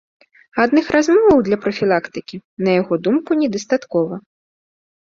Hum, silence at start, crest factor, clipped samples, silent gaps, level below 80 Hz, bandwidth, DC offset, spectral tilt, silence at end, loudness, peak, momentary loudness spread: none; 0.55 s; 18 dB; under 0.1%; 2.45-2.57 s; -52 dBFS; 7.6 kHz; under 0.1%; -6 dB/octave; 0.85 s; -17 LUFS; 0 dBFS; 14 LU